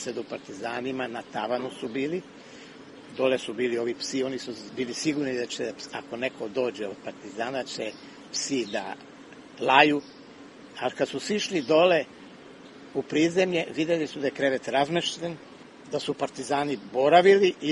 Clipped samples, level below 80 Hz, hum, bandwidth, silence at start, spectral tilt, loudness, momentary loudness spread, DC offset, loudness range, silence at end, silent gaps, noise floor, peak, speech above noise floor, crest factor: under 0.1%; -70 dBFS; none; 11.5 kHz; 0 s; -4 dB/octave; -27 LUFS; 25 LU; under 0.1%; 7 LU; 0 s; none; -47 dBFS; -2 dBFS; 21 dB; 26 dB